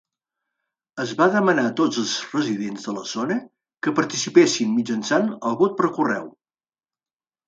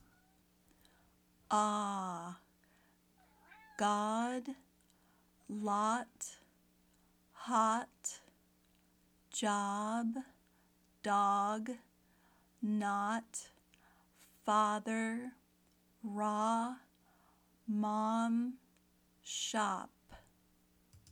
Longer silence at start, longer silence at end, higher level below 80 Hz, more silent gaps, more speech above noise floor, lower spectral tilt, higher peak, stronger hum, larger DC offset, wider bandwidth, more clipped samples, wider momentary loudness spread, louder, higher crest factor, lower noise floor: second, 0.95 s vs 1.5 s; first, 1.2 s vs 0.15 s; first, -70 dBFS vs -78 dBFS; neither; first, over 69 dB vs 36 dB; about the same, -4 dB/octave vs -4 dB/octave; first, -2 dBFS vs -20 dBFS; neither; neither; second, 9.2 kHz vs 17 kHz; neither; second, 12 LU vs 18 LU; first, -22 LUFS vs -37 LUFS; about the same, 20 dB vs 20 dB; first, under -90 dBFS vs -72 dBFS